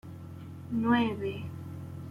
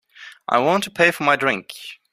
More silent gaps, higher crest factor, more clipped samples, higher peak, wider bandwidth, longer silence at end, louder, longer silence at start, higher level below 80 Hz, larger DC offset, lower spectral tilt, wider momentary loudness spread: neither; about the same, 16 dB vs 20 dB; neither; second, -16 dBFS vs -2 dBFS; second, 12 kHz vs 15.5 kHz; second, 0 s vs 0.2 s; second, -32 LUFS vs -19 LUFS; second, 0.05 s vs 0.2 s; about the same, -66 dBFS vs -64 dBFS; neither; first, -7.5 dB/octave vs -4 dB/octave; about the same, 18 LU vs 18 LU